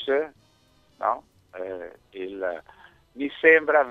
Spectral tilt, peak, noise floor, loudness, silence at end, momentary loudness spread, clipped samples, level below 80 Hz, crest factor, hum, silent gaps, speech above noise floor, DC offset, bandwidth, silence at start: -5.5 dB/octave; -4 dBFS; -61 dBFS; -24 LUFS; 0 s; 21 LU; under 0.1%; -66 dBFS; 22 dB; none; none; 38 dB; under 0.1%; 4.7 kHz; 0 s